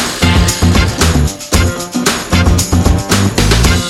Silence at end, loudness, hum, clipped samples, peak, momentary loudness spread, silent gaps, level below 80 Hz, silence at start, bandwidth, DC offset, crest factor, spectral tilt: 0 s; -11 LUFS; none; under 0.1%; 0 dBFS; 4 LU; none; -18 dBFS; 0 s; 16.5 kHz; under 0.1%; 10 dB; -4.5 dB/octave